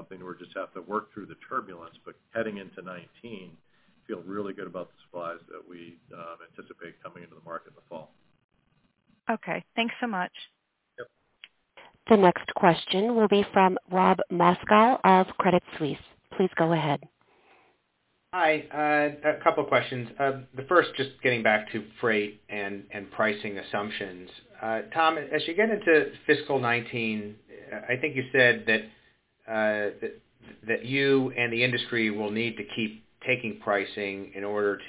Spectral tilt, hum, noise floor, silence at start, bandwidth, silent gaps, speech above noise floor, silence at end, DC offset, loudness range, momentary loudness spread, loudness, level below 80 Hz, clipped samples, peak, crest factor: -9 dB/octave; none; -73 dBFS; 0 s; 4 kHz; 8.44-8.49 s; 46 dB; 0 s; under 0.1%; 17 LU; 23 LU; -26 LUFS; -66 dBFS; under 0.1%; -6 dBFS; 22 dB